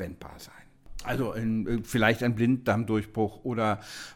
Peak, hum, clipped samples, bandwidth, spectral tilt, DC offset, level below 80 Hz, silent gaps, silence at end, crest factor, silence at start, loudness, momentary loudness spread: -8 dBFS; none; under 0.1%; 17 kHz; -6.5 dB/octave; under 0.1%; -48 dBFS; none; 0 s; 20 dB; 0 s; -28 LUFS; 20 LU